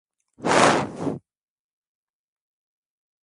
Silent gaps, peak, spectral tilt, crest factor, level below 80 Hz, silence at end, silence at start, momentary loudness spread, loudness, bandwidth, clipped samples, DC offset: none; 0 dBFS; -4 dB/octave; 26 dB; -60 dBFS; 2.05 s; 0.4 s; 14 LU; -21 LUFS; 11.5 kHz; under 0.1%; under 0.1%